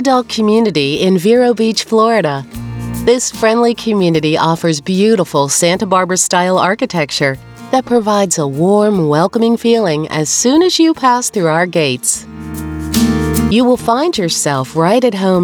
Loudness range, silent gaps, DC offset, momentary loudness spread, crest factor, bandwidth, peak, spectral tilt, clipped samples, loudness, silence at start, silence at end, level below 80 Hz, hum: 2 LU; none; under 0.1%; 6 LU; 12 dB; over 20 kHz; 0 dBFS; -4.5 dB/octave; under 0.1%; -12 LUFS; 0 s; 0 s; -38 dBFS; none